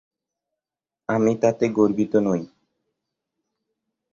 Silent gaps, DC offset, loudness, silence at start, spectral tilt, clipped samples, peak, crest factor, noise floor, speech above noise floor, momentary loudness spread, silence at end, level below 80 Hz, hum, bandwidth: none; under 0.1%; -21 LUFS; 1.1 s; -7.5 dB/octave; under 0.1%; -4 dBFS; 20 dB; -89 dBFS; 69 dB; 8 LU; 1.65 s; -62 dBFS; none; 7.4 kHz